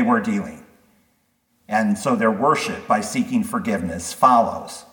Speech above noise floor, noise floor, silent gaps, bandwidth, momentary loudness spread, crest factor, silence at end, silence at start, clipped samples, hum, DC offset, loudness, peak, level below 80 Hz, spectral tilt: 46 dB; -66 dBFS; none; 19 kHz; 10 LU; 20 dB; 0.1 s; 0 s; under 0.1%; none; under 0.1%; -20 LUFS; -2 dBFS; -56 dBFS; -5 dB/octave